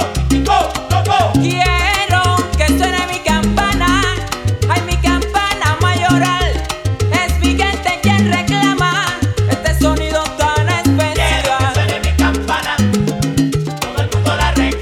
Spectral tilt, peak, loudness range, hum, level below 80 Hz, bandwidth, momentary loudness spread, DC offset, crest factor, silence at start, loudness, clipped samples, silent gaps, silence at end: -5 dB/octave; 0 dBFS; 1 LU; none; -22 dBFS; 17 kHz; 4 LU; under 0.1%; 14 dB; 0 s; -14 LUFS; under 0.1%; none; 0 s